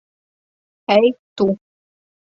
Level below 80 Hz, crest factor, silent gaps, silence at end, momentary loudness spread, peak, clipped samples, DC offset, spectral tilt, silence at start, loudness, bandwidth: -62 dBFS; 20 dB; 1.19-1.36 s; 0.75 s; 13 LU; -2 dBFS; under 0.1%; under 0.1%; -7 dB/octave; 0.9 s; -18 LUFS; 7.4 kHz